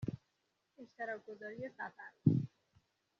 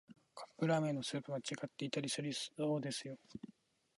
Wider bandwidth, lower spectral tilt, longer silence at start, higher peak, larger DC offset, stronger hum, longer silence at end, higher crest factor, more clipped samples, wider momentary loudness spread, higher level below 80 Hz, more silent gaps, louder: second, 6.6 kHz vs 11.5 kHz; first, -9 dB/octave vs -5 dB/octave; about the same, 0 s vs 0.1 s; first, -16 dBFS vs -24 dBFS; neither; neither; first, 0.7 s vs 0.45 s; first, 26 dB vs 18 dB; neither; about the same, 20 LU vs 18 LU; first, -72 dBFS vs -82 dBFS; neither; about the same, -40 LUFS vs -40 LUFS